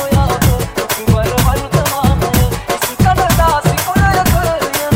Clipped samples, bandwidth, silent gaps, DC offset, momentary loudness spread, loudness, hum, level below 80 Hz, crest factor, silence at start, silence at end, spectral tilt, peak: under 0.1%; 17 kHz; none; under 0.1%; 5 LU; -13 LUFS; none; -20 dBFS; 12 dB; 0 s; 0 s; -5 dB/octave; -2 dBFS